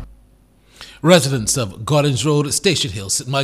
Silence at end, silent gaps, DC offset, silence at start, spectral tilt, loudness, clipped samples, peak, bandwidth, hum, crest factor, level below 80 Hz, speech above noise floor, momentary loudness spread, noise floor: 0 s; none; under 0.1%; 0 s; -4 dB/octave; -17 LUFS; under 0.1%; 0 dBFS; 15.5 kHz; none; 18 dB; -46 dBFS; 35 dB; 7 LU; -52 dBFS